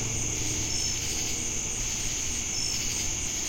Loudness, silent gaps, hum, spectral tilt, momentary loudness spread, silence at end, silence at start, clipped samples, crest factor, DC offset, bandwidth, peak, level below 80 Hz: -28 LUFS; none; none; -1.5 dB/octave; 2 LU; 0 s; 0 s; under 0.1%; 14 dB; under 0.1%; 16.5 kHz; -16 dBFS; -40 dBFS